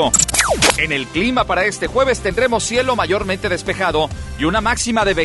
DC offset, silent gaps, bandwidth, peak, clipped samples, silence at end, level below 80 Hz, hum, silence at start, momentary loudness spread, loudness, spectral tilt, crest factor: under 0.1%; none; 12 kHz; 0 dBFS; under 0.1%; 0 s; -32 dBFS; none; 0 s; 7 LU; -16 LUFS; -2.5 dB/octave; 16 dB